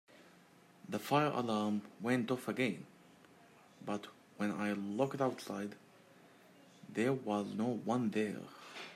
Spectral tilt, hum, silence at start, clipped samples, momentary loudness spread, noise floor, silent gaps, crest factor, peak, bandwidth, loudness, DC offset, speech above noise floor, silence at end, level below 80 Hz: -6 dB/octave; none; 0.1 s; under 0.1%; 15 LU; -63 dBFS; none; 18 dB; -20 dBFS; 16 kHz; -37 LUFS; under 0.1%; 27 dB; 0 s; -84 dBFS